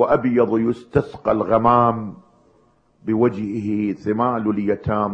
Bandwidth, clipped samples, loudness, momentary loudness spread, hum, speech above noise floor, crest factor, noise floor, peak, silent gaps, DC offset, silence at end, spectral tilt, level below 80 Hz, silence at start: 7.8 kHz; under 0.1%; -20 LUFS; 9 LU; none; 39 dB; 18 dB; -58 dBFS; -2 dBFS; none; under 0.1%; 0 s; -9.5 dB/octave; -48 dBFS; 0 s